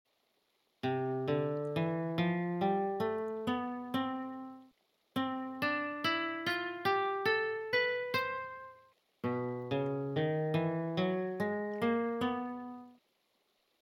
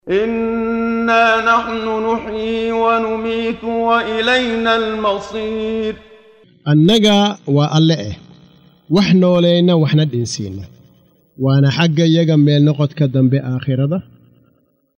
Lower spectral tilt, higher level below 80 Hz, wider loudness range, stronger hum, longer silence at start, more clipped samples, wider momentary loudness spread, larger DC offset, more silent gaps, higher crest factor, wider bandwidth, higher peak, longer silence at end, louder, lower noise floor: about the same, -7 dB/octave vs -6.5 dB/octave; second, -80 dBFS vs -48 dBFS; about the same, 3 LU vs 2 LU; neither; first, 0.85 s vs 0.05 s; neither; about the same, 10 LU vs 10 LU; neither; neither; about the same, 16 dB vs 14 dB; first, 17 kHz vs 9.6 kHz; second, -20 dBFS vs 0 dBFS; about the same, 0.95 s vs 1 s; second, -35 LUFS vs -15 LUFS; first, -77 dBFS vs -58 dBFS